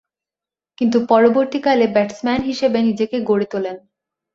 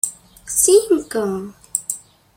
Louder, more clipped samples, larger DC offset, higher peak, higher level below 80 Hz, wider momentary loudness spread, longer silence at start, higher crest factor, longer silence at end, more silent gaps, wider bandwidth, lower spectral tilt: about the same, -17 LUFS vs -18 LUFS; neither; neither; about the same, -2 dBFS vs 0 dBFS; about the same, -54 dBFS vs -54 dBFS; second, 10 LU vs 15 LU; first, 0.8 s vs 0.05 s; about the same, 16 dB vs 20 dB; first, 0.55 s vs 0.4 s; neither; second, 7.6 kHz vs 16.5 kHz; first, -6 dB/octave vs -3 dB/octave